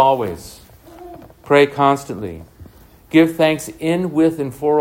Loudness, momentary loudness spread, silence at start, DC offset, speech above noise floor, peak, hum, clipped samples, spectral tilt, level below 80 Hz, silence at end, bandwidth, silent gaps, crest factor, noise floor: -17 LUFS; 23 LU; 0 s; under 0.1%; 28 dB; 0 dBFS; none; under 0.1%; -6 dB/octave; -50 dBFS; 0 s; 16.5 kHz; none; 18 dB; -44 dBFS